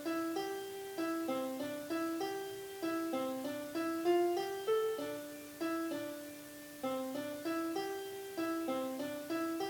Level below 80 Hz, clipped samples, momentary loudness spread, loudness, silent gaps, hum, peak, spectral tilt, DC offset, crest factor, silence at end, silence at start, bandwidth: -78 dBFS; under 0.1%; 9 LU; -39 LUFS; none; none; -22 dBFS; -4 dB/octave; under 0.1%; 16 dB; 0 s; 0 s; 20 kHz